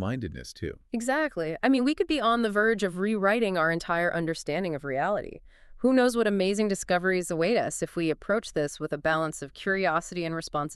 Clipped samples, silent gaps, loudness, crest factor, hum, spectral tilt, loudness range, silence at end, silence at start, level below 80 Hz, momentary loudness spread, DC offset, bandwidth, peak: under 0.1%; none; -27 LUFS; 18 dB; none; -5 dB/octave; 2 LU; 0 s; 0 s; -54 dBFS; 8 LU; under 0.1%; 13.5 kHz; -10 dBFS